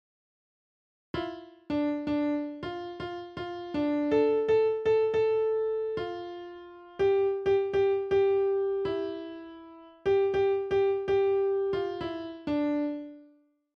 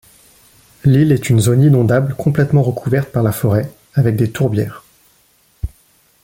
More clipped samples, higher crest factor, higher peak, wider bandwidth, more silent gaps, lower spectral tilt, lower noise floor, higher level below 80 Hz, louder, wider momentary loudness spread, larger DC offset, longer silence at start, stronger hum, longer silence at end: neither; about the same, 14 dB vs 14 dB; second, -14 dBFS vs -2 dBFS; second, 6.2 kHz vs 17 kHz; neither; about the same, -7.5 dB/octave vs -7.5 dB/octave; first, -62 dBFS vs -55 dBFS; second, -60 dBFS vs -40 dBFS; second, -29 LUFS vs -15 LUFS; about the same, 14 LU vs 12 LU; neither; first, 1.15 s vs 0.85 s; neither; about the same, 0.55 s vs 0.55 s